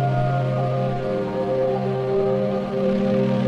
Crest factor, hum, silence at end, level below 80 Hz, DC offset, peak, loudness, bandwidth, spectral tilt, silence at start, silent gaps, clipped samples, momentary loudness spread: 12 dB; none; 0 s; -46 dBFS; under 0.1%; -10 dBFS; -22 LUFS; 7 kHz; -9 dB/octave; 0 s; none; under 0.1%; 3 LU